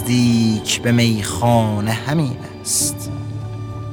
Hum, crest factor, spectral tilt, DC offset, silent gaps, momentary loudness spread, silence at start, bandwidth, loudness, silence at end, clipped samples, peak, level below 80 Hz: none; 16 dB; -4.5 dB/octave; under 0.1%; none; 12 LU; 0 s; 17.5 kHz; -18 LUFS; 0 s; under 0.1%; -2 dBFS; -46 dBFS